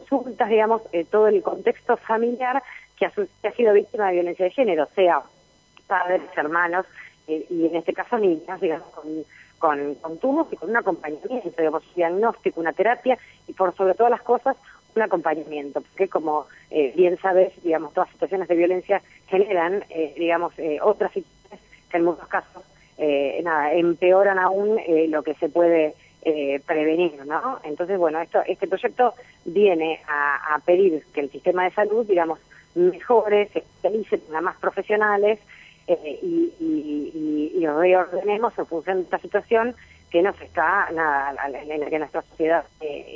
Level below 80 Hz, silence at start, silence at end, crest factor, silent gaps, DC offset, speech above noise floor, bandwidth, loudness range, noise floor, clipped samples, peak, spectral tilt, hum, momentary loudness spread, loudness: -64 dBFS; 0 s; 0 s; 16 dB; none; under 0.1%; 34 dB; 7.4 kHz; 4 LU; -56 dBFS; under 0.1%; -6 dBFS; -7 dB/octave; none; 10 LU; -22 LUFS